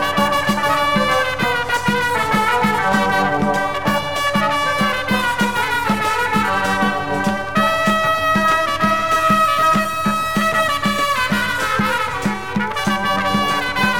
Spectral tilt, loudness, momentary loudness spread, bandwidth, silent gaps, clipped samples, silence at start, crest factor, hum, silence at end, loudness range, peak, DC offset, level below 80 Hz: -4 dB/octave; -17 LUFS; 4 LU; 19 kHz; none; under 0.1%; 0 s; 14 dB; none; 0 s; 2 LU; -4 dBFS; 2%; -44 dBFS